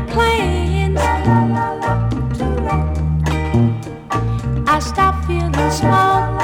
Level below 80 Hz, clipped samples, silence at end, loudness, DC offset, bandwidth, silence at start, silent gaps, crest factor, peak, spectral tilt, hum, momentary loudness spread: -24 dBFS; under 0.1%; 0 s; -17 LUFS; under 0.1%; 16 kHz; 0 s; none; 14 dB; -2 dBFS; -6.5 dB/octave; none; 5 LU